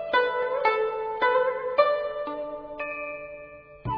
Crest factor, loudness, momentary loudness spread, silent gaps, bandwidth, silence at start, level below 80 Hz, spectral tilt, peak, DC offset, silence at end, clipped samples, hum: 20 dB; -26 LUFS; 15 LU; none; 5.4 kHz; 0 s; -56 dBFS; -6.5 dB/octave; -6 dBFS; under 0.1%; 0 s; under 0.1%; none